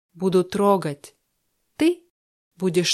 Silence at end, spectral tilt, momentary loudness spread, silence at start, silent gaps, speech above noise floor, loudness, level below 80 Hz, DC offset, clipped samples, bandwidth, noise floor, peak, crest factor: 0 s; -5 dB/octave; 12 LU; 0.15 s; 2.10-2.51 s; 51 dB; -22 LUFS; -64 dBFS; under 0.1%; under 0.1%; 14 kHz; -72 dBFS; -6 dBFS; 18 dB